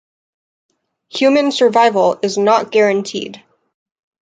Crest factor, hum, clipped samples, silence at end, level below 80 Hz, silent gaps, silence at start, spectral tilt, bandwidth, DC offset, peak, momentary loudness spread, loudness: 14 dB; none; under 0.1%; 0.9 s; -66 dBFS; none; 1.15 s; -4 dB/octave; 9.2 kHz; under 0.1%; -2 dBFS; 13 LU; -14 LUFS